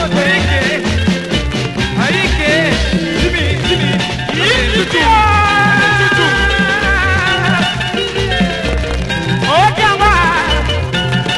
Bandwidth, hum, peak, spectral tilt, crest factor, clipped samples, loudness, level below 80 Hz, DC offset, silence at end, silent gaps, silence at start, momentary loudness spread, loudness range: 12 kHz; none; 0 dBFS; -4.5 dB/octave; 12 dB; under 0.1%; -12 LUFS; -24 dBFS; under 0.1%; 0 s; none; 0 s; 6 LU; 3 LU